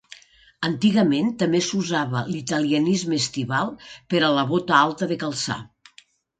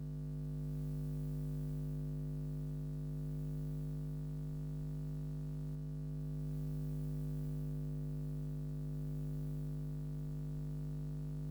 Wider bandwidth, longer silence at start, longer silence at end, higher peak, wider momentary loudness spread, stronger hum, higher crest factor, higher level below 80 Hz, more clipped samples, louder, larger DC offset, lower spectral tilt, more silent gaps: second, 9.4 kHz vs over 20 kHz; about the same, 0.1 s vs 0 s; first, 0.75 s vs 0 s; first, -2 dBFS vs -32 dBFS; first, 8 LU vs 2 LU; second, none vs 50 Hz at -40 dBFS; first, 20 dB vs 8 dB; second, -62 dBFS vs -50 dBFS; neither; first, -22 LUFS vs -43 LUFS; neither; second, -4.5 dB/octave vs -9.5 dB/octave; neither